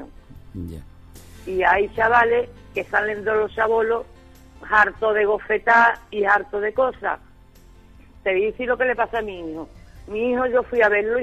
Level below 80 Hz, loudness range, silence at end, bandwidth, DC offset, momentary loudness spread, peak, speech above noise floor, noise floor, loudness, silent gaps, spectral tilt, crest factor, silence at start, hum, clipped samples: -46 dBFS; 5 LU; 0 s; 13.5 kHz; under 0.1%; 18 LU; -4 dBFS; 27 dB; -48 dBFS; -20 LUFS; none; -5.5 dB/octave; 18 dB; 0 s; none; under 0.1%